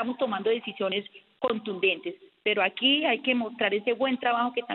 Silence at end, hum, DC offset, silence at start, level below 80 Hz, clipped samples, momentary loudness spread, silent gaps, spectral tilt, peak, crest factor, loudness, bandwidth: 0 s; none; under 0.1%; 0 s; -76 dBFS; under 0.1%; 9 LU; none; -7.5 dB/octave; -8 dBFS; 18 dB; -26 LUFS; 4.3 kHz